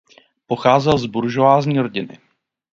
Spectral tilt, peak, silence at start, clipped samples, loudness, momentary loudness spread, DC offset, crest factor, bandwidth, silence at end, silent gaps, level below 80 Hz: -7 dB/octave; 0 dBFS; 0.5 s; under 0.1%; -17 LUFS; 12 LU; under 0.1%; 18 dB; 7.6 kHz; 0.65 s; none; -52 dBFS